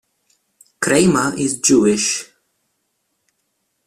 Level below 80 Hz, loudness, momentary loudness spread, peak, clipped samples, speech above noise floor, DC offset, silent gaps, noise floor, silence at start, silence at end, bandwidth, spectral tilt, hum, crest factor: -54 dBFS; -16 LUFS; 8 LU; -2 dBFS; under 0.1%; 55 dB; under 0.1%; none; -70 dBFS; 0.8 s; 1.6 s; 14.5 kHz; -3.5 dB/octave; none; 18 dB